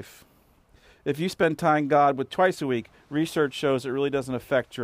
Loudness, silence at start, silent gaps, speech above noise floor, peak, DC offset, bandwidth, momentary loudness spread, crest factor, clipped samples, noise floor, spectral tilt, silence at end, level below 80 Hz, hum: -25 LUFS; 0 s; none; 34 dB; -10 dBFS; under 0.1%; 16 kHz; 9 LU; 16 dB; under 0.1%; -59 dBFS; -6 dB/octave; 0 s; -62 dBFS; none